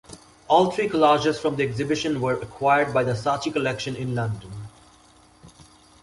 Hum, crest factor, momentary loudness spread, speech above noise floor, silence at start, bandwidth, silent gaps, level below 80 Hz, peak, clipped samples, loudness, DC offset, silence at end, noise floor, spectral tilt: none; 20 dB; 11 LU; 32 dB; 0.1 s; 11.5 kHz; none; -56 dBFS; -4 dBFS; under 0.1%; -23 LUFS; under 0.1%; 0.4 s; -54 dBFS; -5.5 dB/octave